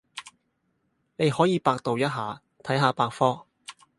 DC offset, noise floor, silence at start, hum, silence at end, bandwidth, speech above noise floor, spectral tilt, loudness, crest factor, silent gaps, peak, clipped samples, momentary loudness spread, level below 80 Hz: under 0.1%; -73 dBFS; 0.15 s; none; 0.25 s; 11.5 kHz; 49 dB; -6 dB/octave; -25 LUFS; 22 dB; none; -6 dBFS; under 0.1%; 19 LU; -66 dBFS